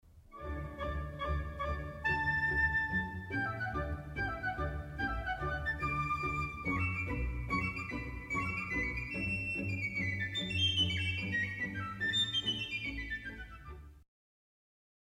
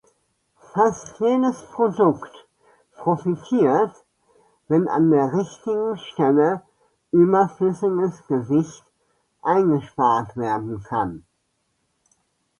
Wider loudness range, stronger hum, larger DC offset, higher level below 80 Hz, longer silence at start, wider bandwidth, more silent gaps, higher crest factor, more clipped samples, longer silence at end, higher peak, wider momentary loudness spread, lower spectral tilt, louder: about the same, 4 LU vs 3 LU; neither; neither; first, -46 dBFS vs -60 dBFS; second, 0.15 s vs 0.75 s; first, 15.5 kHz vs 11 kHz; neither; about the same, 16 dB vs 18 dB; neither; second, 1.05 s vs 1.4 s; second, -20 dBFS vs -4 dBFS; about the same, 10 LU vs 9 LU; second, -4.5 dB/octave vs -7.5 dB/octave; second, -35 LUFS vs -21 LUFS